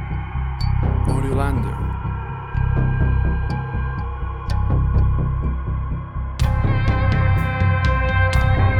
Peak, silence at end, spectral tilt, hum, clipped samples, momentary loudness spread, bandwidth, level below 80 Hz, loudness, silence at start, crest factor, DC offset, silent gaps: -6 dBFS; 0 s; -7.5 dB/octave; none; under 0.1%; 9 LU; 11 kHz; -22 dBFS; -21 LUFS; 0 s; 14 dB; under 0.1%; none